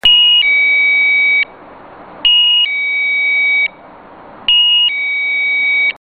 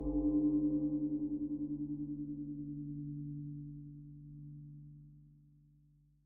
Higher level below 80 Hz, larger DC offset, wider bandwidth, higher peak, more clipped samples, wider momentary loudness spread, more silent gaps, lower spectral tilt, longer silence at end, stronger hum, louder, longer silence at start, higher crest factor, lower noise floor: first, -50 dBFS vs -56 dBFS; neither; first, 9 kHz vs 1.2 kHz; first, 0 dBFS vs -24 dBFS; neither; second, 7 LU vs 20 LU; neither; second, -1 dB/octave vs -11 dB/octave; second, 0.1 s vs 0.85 s; neither; first, -10 LUFS vs -38 LUFS; about the same, 0.05 s vs 0 s; about the same, 12 dB vs 14 dB; second, -37 dBFS vs -68 dBFS